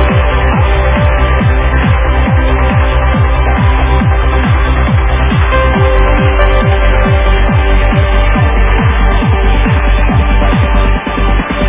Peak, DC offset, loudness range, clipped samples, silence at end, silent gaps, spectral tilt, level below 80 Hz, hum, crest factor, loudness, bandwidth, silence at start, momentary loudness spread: 0 dBFS; under 0.1%; 1 LU; under 0.1%; 0 s; none; -10.5 dB/octave; -10 dBFS; none; 8 dB; -10 LUFS; 3.8 kHz; 0 s; 1 LU